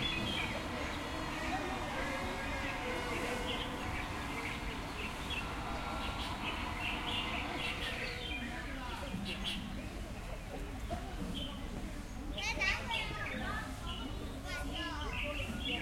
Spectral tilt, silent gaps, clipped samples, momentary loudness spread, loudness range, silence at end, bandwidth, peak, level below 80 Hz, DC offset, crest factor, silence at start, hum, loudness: -4 dB/octave; none; under 0.1%; 8 LU; 4 LU; 0 s; 16.5 kHz; -20 dBFS; -46 dBFS; under 0.1%; 20 dB; 0 s; none; -39 LUFS